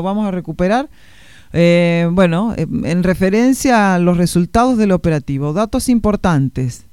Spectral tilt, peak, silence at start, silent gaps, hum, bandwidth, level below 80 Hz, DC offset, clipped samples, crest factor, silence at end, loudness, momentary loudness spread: -6.5 dB/octave; 0 dBFS; 0 s; none; none; 15 kHz; -34 dBFS; 0.8%; under 0.1%; 14 dB; 0.15 s; -15 LUFS; 7 LU